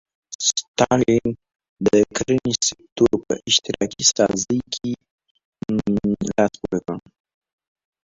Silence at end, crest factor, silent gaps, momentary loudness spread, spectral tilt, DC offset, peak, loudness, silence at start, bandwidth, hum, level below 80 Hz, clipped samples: 1.1 s; 20 dB; 0.35-0.39 s, 0.68-0.74 s, 1.69-1.76 s, 2.92-2.96 s, 5.11-5.18 s, 5.31-5.35 s, 5.45-5.52 s; 11 LU; -3.5 dB/octave; under 0.1%; 0 dBFS; -20 LUFS; 0.3 s; 8 kHz; none; -50 dBFS; under 0.1%